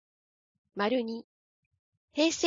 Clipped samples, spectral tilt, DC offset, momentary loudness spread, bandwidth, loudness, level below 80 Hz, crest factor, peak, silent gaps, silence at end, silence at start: under 0.1%; -3 dB/octave; under 0.1%; 14 LU; 7.8 kHz; -31 LUFS; -74 dBFS; 22 dB; -12 dBFS; 1.24-1.71 s, 1.79-2.08 s; 0 s; 0.75 s